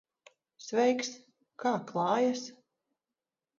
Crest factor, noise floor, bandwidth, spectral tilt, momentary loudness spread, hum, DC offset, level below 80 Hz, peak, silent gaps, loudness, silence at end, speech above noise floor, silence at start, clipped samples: 20 dB; under -90 dBFS; 7.6 kHz; -4.5 dB/octave; 18 LU; none; under 0.1%; -84 dBFS; -14 dBFS; none; -31 LUFS; 1.05 s; over 60 dB; 0.6 s; under 0.1%